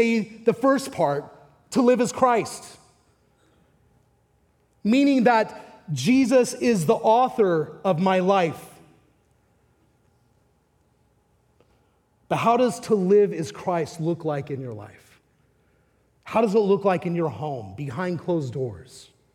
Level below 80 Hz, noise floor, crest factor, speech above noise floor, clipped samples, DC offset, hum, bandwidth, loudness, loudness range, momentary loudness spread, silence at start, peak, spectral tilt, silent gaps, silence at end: -66 dBFS; -65 dBFS; 20 dB; 43 dB; under 0.1%; under 0.1%; none; 16.5 kHz; -22 LUFS; 7 LU; 14 LU; 0 s; -4 dBFS; -6 dB/octave; none; 0.35 s